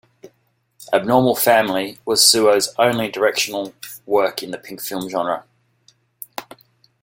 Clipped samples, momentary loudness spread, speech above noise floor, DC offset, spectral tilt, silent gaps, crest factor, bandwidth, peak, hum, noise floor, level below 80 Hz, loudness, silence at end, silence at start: under 0.1%; 20 LU; 47 dB; under 0.1%; -2.5 dB/octave; none; 20 dB; 17 kHz; 0 dBFS; none; -65 dBFS; -60 dBFS; -17 LUFS; 0.6 s; 0.25 s